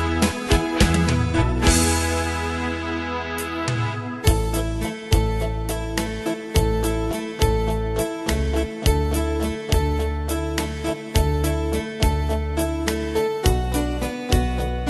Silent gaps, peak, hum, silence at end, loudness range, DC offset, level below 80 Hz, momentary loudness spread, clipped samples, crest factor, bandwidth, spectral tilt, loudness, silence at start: none; -2 dBFS; none; 0 s; 3 LU; under 0.1%; -26 dBFS; 7 LU; under 0.1%; 18 dB; 12.5 kHz; -5 dB/octave; -23 LUFS; 0 s